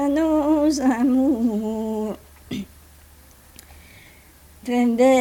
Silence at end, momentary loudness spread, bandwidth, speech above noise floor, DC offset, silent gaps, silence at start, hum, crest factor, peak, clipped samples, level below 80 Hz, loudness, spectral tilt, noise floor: 0 s; 16 LU; 18.5 kHz; 30 dB; under 0.1%; none; 0 s; none; 14 dB; -8 dBFS; under 0.1%; -48 dBFS; -21 LUFS; -5.5 dB/octave; -49 dBFS